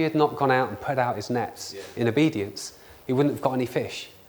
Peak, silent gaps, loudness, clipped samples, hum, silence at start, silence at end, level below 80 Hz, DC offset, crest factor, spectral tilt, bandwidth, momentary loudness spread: -6 dBFS; none; -25 LUFS; under 0.1%; none; 0 s; 0.15 s; -62 dBFS; under 0.1%; 20 dB; -6 dB/octave; over 20 kHz; 13 LU